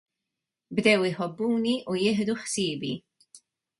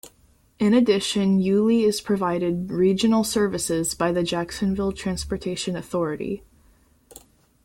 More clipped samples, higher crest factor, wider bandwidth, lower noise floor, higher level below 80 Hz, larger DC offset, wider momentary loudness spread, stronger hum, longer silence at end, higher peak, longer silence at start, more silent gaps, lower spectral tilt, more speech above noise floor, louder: neither; about the same, 20 dB vs 16 dB; second, 11.5 kHz vs 16.5 kHz; first, -86 dBFS vs -59 dBFS; second, -68 dBFS vs -48 dBFS; neither; about the same, 11 LU vs 9 LU; neither; second, 0.45 s vs 1.25 s; about the same, -8 dBFS vs -6 dBFS; first, 0.7 s vs 0.05 s; neither; about the same, -4.5 dB/octave vs -5 dB/octave; first, 60 dB vs 37 dB; second, -26 LUFS vs -23 LUFS